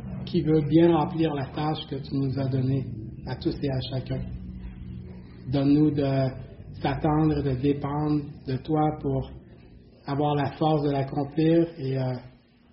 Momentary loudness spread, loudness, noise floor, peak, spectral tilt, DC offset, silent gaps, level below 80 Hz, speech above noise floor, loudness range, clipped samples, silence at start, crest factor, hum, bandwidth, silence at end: 17 LU; -26 LUFS; -50 dBFS; -8 dBFS; -7.5 dB/octave; under 0.1%; none; -46 dBFS; 25 dB; 5 LU; under 0.1%; 0 s; 18 dB; none; 5.8 kHz; 0.4 s